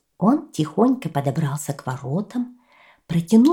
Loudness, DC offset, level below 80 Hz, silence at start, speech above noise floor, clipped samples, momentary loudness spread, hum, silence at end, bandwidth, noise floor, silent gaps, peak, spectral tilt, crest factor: -22 LUFS; under 0.1%; -60 dBFS; 0.2 s; 32 dB; under 0.1%; 10 LU; none; 0 s; 16.5 kHz; -52 dBFS; none; -4 dBFS; -7 dB/octave; 16 dB